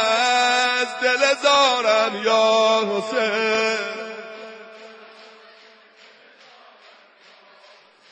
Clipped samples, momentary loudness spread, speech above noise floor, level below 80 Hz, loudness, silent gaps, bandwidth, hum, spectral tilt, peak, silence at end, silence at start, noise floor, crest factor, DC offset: under 0.1%; 20 LU; 32 dB; -70 dBFS; -18 LUFS; none; 10.5 kHz; none; -1.5 dB/octave; -6 dBFS; 2.85 s; 0 s; -51 dBFS; 16 dB; under 0.1%